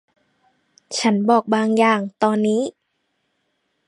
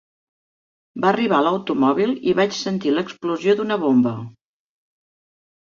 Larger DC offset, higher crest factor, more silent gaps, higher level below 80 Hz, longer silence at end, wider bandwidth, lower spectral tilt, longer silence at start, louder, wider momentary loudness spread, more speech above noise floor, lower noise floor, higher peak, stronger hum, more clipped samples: neither; about the same, 18 dB vs 18 dB; neither; second, -74 dBFS vs -64 dBFS; about the same, 1.2 s vs 1.3 s; first, 11 kHz vs 7.4 kHz; about the same, -5 dB/octave vs -6 dB/octave; about the same, 0.9 s vs 0.95 s; about the same, -19 LUFS vs -20 LUFS; about the same, 7 LU vs 7 LU; second, 54 dB vs over 71 dB; second, -71 dBFS vs under -90 dBFS; about the same, -2 dBFS vs -4 dBFS; neither; neither